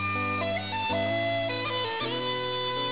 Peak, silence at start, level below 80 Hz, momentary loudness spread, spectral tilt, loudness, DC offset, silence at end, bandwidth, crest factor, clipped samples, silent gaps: -18 dBFS; 0 s; -54 dBFS; 2 LU; -2 dB/octave; -28 LUFS; 0.3%; 0 s; 4 kHz; 12 dB; under 0.1%; none